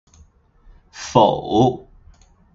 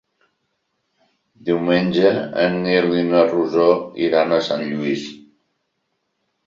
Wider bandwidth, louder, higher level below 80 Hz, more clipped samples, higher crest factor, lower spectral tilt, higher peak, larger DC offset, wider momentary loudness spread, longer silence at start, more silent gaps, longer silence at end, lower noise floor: about the same, 7.8 kHz vs 7.6 kHz; about the same, -17 LUFS vs -18 LUFS; first, -48 dBFS vs -60 dBFS; neither; about the same, 20 dB vs 18 dB; about the same, -6.5 dB/octave vs -6.5 dB/octave; about the same, 0 dBFS vs -2 dBFS; neither; first, 18 LU vs 7 LU; second, 0.95 s vs 1.45 s; neither; second, 0.75 s vs 1.25 s; second, -52 dBFS vs -72 dBFS